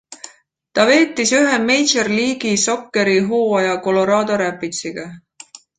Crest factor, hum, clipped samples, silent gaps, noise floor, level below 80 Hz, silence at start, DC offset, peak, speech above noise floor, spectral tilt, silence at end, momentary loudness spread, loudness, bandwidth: 16 dB; none; under 0.1%; none; -49 dBFS; -60 dBFS; 0.1 s; under 0.1%; -2 dBFS; 33 dB; -3 dB/octave; 0.6 s; 12 LU; -16 LUFS; 9.6 kHz